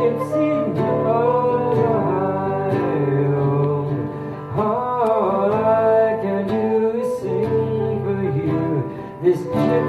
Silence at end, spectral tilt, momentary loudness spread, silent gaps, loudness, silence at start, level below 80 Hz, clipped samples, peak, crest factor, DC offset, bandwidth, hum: 0 s; -9 dB/octave; 5 LU; none; -20 LUFS; 0 s; -54 dBFS; under 0.1%; -6 dBFS; 14 dB; under 0.1%; 12.5 kHz; none